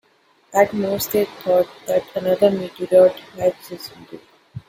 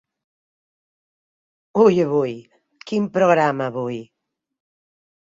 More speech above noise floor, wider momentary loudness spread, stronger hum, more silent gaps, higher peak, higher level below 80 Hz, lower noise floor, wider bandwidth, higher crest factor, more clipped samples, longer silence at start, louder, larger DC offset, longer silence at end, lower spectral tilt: second, 39 dB vs over 72 dB; first, 19 LU vs 13 LU; neither; neither; about the same, -2 dBFS vs -2 dBFS; first, -58 dBFS vs -66 dBFS; second, -58 dBFS vs under -90 dBFS; first, 17 kHz vs 7.6 kHz; about the same, 18 dB vs 20 dB; neither; second, 0.55 s vs 1.75 s; about the same, -19 LUFS vs -19 LUFS; neither; second, 0.1 s vs 1.35 s; second, -5 dB/octave vs -7 dB/octave